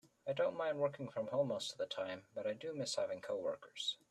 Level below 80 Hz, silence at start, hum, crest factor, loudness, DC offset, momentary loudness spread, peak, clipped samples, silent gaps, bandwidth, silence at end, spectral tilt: -84 dBFS; 0.05 s; none; 16 dB; -41 LUFS; under 0.1%; 6 LU; -24 dBFS; under 0.1%; none; 13 kHz; 0.15 s; -4 dB/octave